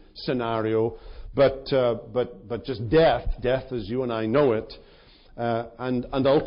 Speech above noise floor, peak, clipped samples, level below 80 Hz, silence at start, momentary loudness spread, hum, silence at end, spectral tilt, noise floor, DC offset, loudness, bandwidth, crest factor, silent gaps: 28 dB; -10 dBFS; under 0.1%; -40 dBFS; 0.15 s; 10 LU; none; 0 s; -5.5 dB/octave; -52 dBFS; under 0.1%; -25 LUFS; 5.4 kHz; 14 dB; none